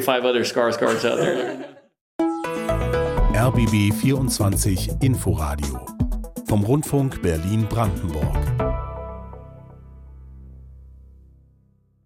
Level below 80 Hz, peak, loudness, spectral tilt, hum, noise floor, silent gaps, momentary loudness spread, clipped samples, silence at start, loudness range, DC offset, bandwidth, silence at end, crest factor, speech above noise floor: -32 dBFS; -4 dBFS; -22 LUFS; -6 dB/octave; none; -59 dBFS; 2.01-2.19 s; 13 LU; under 0.1%; 0 s; 9 LU; under 0.1%; 16.5 kHz; 1.1 s; 18 dB; 39 dB